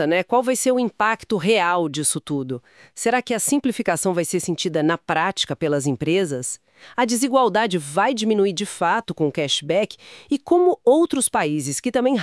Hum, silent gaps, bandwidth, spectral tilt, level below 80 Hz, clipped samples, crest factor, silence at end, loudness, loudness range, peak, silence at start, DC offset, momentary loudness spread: none; none; 12 kHz; -4 dB/octave; -62 dBFS; under 0.1%; 16 dB; 0 s; -21 LUFS; 2 LU; -6 dBFS; 0 s; under 0.1%; 9 LU